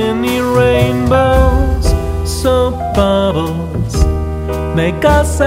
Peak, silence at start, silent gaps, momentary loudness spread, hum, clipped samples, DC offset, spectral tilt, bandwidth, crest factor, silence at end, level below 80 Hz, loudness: 0 dBFS; 0 s; none; 7 LU; none; under 0.1%; under 0.1%; -6 dB/octave; 16 kHz; 12 dB; 0 s; -18 dBFS; -13 LUFS